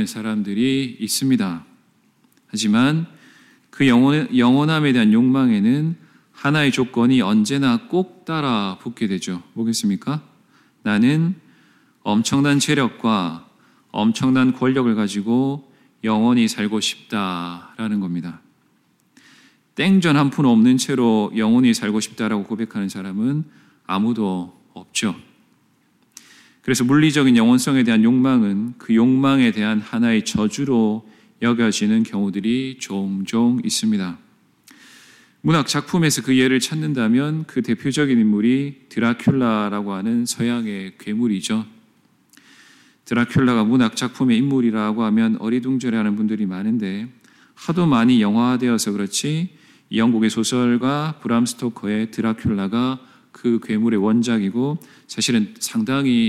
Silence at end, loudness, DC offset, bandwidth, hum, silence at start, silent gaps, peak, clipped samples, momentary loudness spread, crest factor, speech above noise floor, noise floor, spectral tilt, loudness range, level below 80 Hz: 0 s; -19 LUFS; under 0.1%; 14.5 kHz; none; 0 s; none; -4 dBFS; under 0.1%; 11 LU; 14 dB; 43 dB; -61 dBFS; -5 dB/octave; 6 LU; -60 dBFS